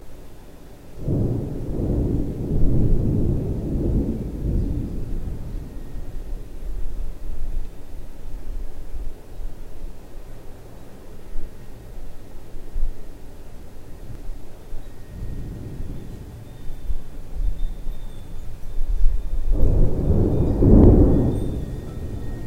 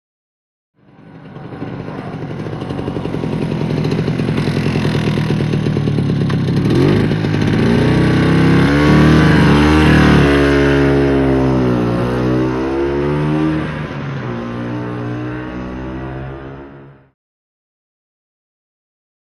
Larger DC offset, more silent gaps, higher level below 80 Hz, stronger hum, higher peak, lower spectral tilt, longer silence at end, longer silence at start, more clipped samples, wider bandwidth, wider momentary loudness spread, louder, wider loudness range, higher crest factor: first, 0.3% vs under 0.1%; neither; about the same, -24 dBFS vs -28 dBFS; neither; about the same, 0 dBFS vs 0 dBFS; first, -9.5 dB/octave vs -7.5 dB/octave; second, 0 s vs 2.45 s; second, 0 s vs 1.05 s; neither; second, 3.8 kHz vs 12 kHz; first, 22 LU vs 16 LU; second, -24 LUFS vs -14 LUFS; first, 20 LU vs 15 LU; first, 20 dB vs 14 dB